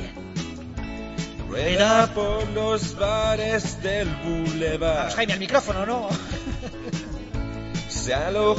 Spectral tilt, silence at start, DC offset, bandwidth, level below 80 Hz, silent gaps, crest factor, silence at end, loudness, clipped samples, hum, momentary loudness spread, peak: -4.5 dB/octave; 0 s; under 0.1%; 8 kHz; -36 dBFS; none; 20 dB; 0 s; -25 LUFS; under 0.1%; none; 12 LU; -4 dBFS